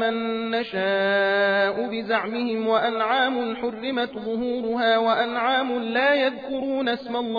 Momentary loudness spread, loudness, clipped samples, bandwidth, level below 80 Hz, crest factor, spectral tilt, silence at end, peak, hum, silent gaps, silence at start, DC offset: 7 LU; -23 LUFS; under 0.1%; 5 kHz; -64 dBFS; 14 dB; -6.5 dB/octave; 0 s; -8 dBFS; none; none; 0 s; under 0.1%